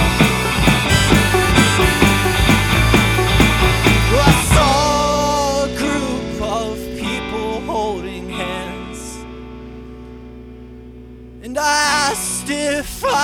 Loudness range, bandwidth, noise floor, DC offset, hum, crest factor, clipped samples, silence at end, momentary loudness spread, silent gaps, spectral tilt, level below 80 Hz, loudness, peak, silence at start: 14 LU; 19.5 kHz; -36 dBFS; under 0.1%; 60 Hz at -40 dBFS; 16 dB; under 0.1%; 0 s; 18 LU; none; -4 dB/octave; -26 dBFS; -15 LUFS; 0 dBFS; 0 s